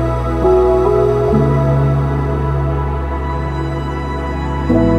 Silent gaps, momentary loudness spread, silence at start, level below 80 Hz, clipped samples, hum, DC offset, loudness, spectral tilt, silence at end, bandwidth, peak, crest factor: none; 8 LU; 0 s; -22 dBFS; under 0.1%; none; under 0.1%; -16 LUFS; -9 dB/octave; 0 s; 8.4 kHz; -2 dBFS; 14 dB